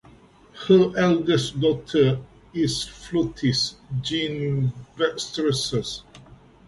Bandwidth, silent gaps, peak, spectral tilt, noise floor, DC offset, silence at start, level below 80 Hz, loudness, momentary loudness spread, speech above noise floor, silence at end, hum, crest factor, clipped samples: 11.5 kHz; none; -4 dBFS; -5.5 dB/octave; -51 dBFS; under 0.1%; 0.55 s; -50 dBFS; -23 LUFS; 10 LU; 29 dB; 0.45 s; none; 18 dB; under 0.1%